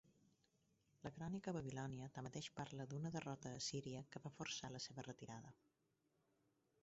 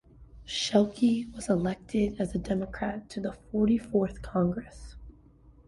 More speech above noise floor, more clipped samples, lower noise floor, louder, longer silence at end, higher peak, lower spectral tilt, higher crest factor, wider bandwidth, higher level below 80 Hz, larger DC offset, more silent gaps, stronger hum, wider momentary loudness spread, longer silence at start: first, 34 dB vs 28 dB; neither; first, -85 dBFS vs -56 dBFS; second, -51 LUFS vs -29 LUFS; first, 1.3 s vs 0.55 s; second, -34 dBFS vs -10 dBFS; about the same, -5 dB/octave vs -6 dB/octave; about the same, 18 dB vs 20 dB; second, 7.6 kHz vs 11.5 kHz; second, -78 dBFS vs -48 dBFS; neither; neither; neither; about the same, 9 LU vs 11 LU; second, 0.05 s vs 0.2 s